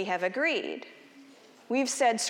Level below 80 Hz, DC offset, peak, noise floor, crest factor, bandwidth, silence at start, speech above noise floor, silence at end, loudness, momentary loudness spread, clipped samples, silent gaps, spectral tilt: under -90 dBFS; under 0.1%; -14 dBFS; -54 dBFS; 16 dB; 17.5 kHz; 0 s; 26 dB; 0 s; -29 LUFS; 15 LU; under 0.1%; none; -2 dB/octave